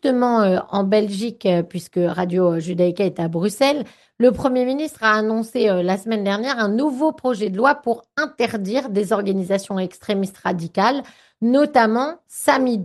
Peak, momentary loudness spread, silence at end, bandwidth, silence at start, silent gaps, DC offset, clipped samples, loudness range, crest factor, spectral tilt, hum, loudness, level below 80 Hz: -2 dBFS; 7 LU; 0 s; 12.5 kHz; 0.05 s; none; under 0.1%; under 0.1%; 2 LU; 18 dB; -6 dB/octave; none; -20 LUFS; -58 dBFS